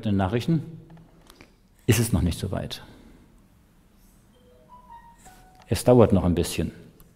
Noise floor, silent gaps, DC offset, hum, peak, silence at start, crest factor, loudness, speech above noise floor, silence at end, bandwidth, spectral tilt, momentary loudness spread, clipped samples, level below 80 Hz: -57 dBFS; none; under 0.1%; none; -2 dBFS; 0 s; 24 dB; -23 LUFS; 35 dB; 0.3 s; 16 kHz; -6.5 dB/octave; 17 LU; under 0.1%; -44 dBFS